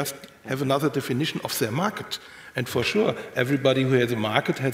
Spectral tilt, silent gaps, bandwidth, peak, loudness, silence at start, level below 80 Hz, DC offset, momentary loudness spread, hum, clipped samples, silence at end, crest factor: -5 dB/octave; none; 16 kHz; -4 dBFS; -25 LUFS; 0 s; -62 dBFS; under 0.1%; 11 LU; none; under 0.1%; 0 s; 22 dB